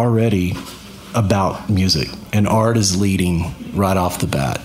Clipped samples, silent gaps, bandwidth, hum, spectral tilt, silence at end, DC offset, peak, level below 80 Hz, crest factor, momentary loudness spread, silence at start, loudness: under 0.1%; none; 16 kHz; none; -5.5 dB/octave; 0 s; under 0.1%; 0 dBFS; -38 dBFS; 16 dB; 8 LU; 0 s; -18 LUFS